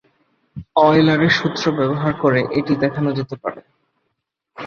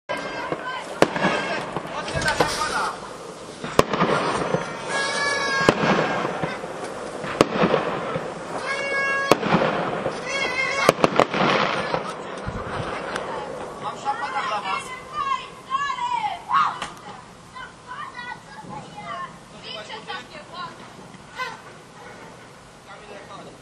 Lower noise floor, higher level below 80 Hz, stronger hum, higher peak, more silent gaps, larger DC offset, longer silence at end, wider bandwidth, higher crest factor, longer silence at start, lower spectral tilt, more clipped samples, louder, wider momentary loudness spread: first, -75 dBFS vs -45 dBFS; about the same, -52 dBFS vs -50 dBFS; neither; about the same, -2 dBFS vs 0 dBFS; neither; neither; about the same, 0 s vs 0 s; second, 7 kHz vs 12.5 kHz; second, 18 dB vs 26 dB; first, 0.55 s vs 0.1 s; first, -6.5 dB/octave vs -4 dB/octave; neither; first, -17 LUFS vs -24 LUFS; second, 15 LU vs 20 LU